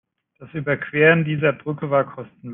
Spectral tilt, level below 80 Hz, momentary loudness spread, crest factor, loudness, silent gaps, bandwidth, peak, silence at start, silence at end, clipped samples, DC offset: -10.5 dB/octave; -62 dBFS; 14 LU; 18 dB; -20 LUFS; none; 3.8 kHz; -4 dBFS; 0.4 s; 0 s; under 0.1%; under 0.1%